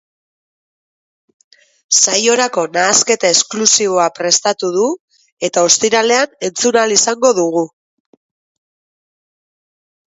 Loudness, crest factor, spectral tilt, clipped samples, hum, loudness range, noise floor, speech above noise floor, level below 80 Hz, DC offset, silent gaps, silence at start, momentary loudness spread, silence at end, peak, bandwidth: -12 LUFS; 16 dB; -1 dB/octave; under 0.1%; none; 5 LU; under -90 dBFS; over 77 dB; -66 dBFS; under 0.1%; 5.00-5.08 s, 5.32-5.37 s; 1.9 s; 8 LU; 2.45 s; 0 dBFS; 8 kHz